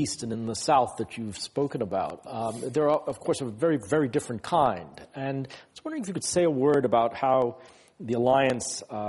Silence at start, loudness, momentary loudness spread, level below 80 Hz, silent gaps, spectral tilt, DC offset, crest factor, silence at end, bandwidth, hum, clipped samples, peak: 0 s; -27 LUFS; 12 LU; -62 dBFS; none; -5 dB/octave; under 0.1%; 18 dB; 0 s; 11.5 kHz; none; under 0.1%; -10 dBFS